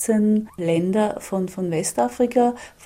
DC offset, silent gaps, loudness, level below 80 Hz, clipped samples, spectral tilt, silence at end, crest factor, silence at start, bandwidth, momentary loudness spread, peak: under 0.1%; none; -22 LUFS; -58 dBFS; under 0.1%; -6 dB/octave; 0 s; 14 dB; 0 s; 16 kHz; 6 LU; -6 dBFS